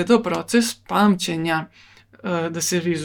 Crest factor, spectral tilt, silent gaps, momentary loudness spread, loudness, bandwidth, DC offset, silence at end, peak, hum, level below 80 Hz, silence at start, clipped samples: 18 dB; -4.5 dB/octave; none; 8 LU; -21 LUFS; 18 kHz; under 0.1%; 0 s; -4 dBFS; none; -58 dBFS; 0 s; under 0.1%